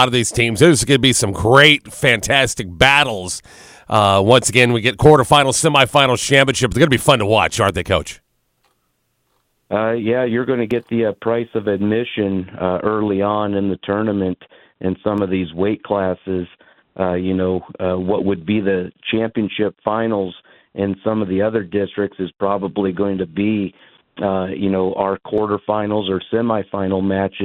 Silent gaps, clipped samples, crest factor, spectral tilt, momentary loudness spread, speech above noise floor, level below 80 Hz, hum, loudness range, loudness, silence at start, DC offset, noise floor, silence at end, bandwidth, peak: none; under 0.1%; 18 dB; -4.5 dB/octave; 10 LU; 50 dB; -44 dBFS; none; 8 LU; -17 LUFS; 0 s; under 0.1%; -67 dBFS; 0 s; 16.5 kHz; 0 dBFS